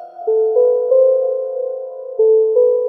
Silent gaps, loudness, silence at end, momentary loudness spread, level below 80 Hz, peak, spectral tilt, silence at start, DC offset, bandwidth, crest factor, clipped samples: none; -15 LUFS; 0 s; 11 LU; -88 dBFS; -4 dBFS; -7.5 dB/octave; 0 s; under 0.1%; 1.5 kHz; 10 dB; under 0.1%